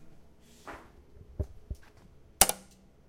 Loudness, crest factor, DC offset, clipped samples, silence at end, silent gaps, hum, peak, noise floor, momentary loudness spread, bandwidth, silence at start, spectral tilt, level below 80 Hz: -28 LUFS; 34 dB; under 0.1%; under 0.1%; 0.5 s; none; none; -2 dBFS; -57 dBFS; 25 LU; 16 kHz; 0 s; -1.5 dB/octave; -48 dBFS